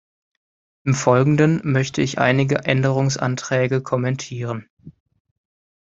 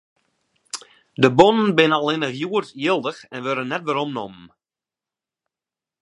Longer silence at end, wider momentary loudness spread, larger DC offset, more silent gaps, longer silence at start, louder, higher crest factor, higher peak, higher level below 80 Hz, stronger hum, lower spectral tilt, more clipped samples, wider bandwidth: second, 0.95 s vs 1.55 s; second, 11 LU vs 19 LU; neither; first, 4.70-4.77 s vs none; about the same, 0.85 s vs 0.75 s; about the same, -20 LUFS vs -20 LUFS; about the same, 20 dB vs 22 dB; about the same, -2 dBFS vs 0 dBFS; first, -56 dBFS vs -62 dBFS; neither; about the same, -6 dB/octave vs -5.5 dB/octave; neither; second, 7.8 kHz vs 11 kHz